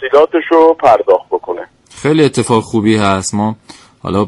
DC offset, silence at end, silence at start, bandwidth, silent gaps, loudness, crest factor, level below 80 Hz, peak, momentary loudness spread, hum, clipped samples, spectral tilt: under 0.1%; 0 s; 0 s; 11.5 kHz; none; -12 LUFS; 12 dB; -48 dBFS; 0 dBFS; 15 LU; none; under 0.1%; -5.5 dB/octave